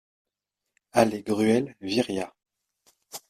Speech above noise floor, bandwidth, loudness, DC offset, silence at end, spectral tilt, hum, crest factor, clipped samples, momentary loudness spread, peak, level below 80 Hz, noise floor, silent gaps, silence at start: 61 dB; 15.5 kHz; -25 LUFS; under 0.1%; 0.1 s; -5 dB/octave; none; 24 dB; under 0.1%; 12 LU; -4 dBFS; -64 dBFS; -85 dBFS; none; 0.95 s